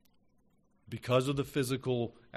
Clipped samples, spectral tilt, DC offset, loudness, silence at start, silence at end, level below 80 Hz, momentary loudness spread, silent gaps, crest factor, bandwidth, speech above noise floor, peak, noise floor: under 0.1%; -6 dB/octave; under 0.1%; -32 LUFS; 0.9 s; 0 s; -64 dBFS; 11 LU; none; 20 dB; 13.5 kHz; 36 dB; -16 dBFS; -69 dBFS